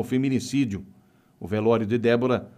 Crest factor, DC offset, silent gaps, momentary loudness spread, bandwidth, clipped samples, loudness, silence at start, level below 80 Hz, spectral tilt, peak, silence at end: 16 dB; under 0.1%; none; 10 LU; 15 kHz; under 0.1%; -24 LUFS; 0 s; -60 dBFS; -6.5 dB/octave; -8 dBFS; 0.1 s